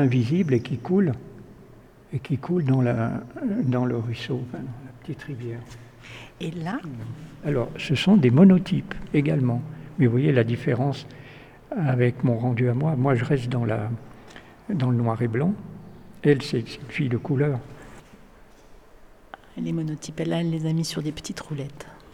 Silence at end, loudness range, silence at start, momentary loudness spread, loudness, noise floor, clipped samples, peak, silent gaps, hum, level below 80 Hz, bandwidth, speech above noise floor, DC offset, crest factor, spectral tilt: 0.15 s; 10 LU; 0 s; 17 LU; -24 LUFS; -49 dBFS; under 0.1%; -4 dBFS; none; none; -52 dBFS; 12 kHz; 26 dB; under 0.1%; 20 dB; -7.5 dB/octave